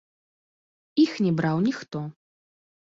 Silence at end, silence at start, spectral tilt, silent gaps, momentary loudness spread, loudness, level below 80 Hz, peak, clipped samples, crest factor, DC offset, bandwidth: 0.8 s; 0.95 s; -7 dB/octave; none; 13 LU; -25 LUFS; -66 dBFS; -10 dBFS; under 0.1%; 18 dB; under 0.1%; 7.6 kHz